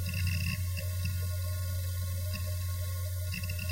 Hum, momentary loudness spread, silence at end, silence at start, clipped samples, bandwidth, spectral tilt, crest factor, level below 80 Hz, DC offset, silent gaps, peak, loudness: none; 3 LU; 0 s; 0 s; under 0.1%; 16 kHz; -4.5 dB/octave; 12 dB; -46 dBFS; under 0.1%; none; -20 dBFS; -34 LUFS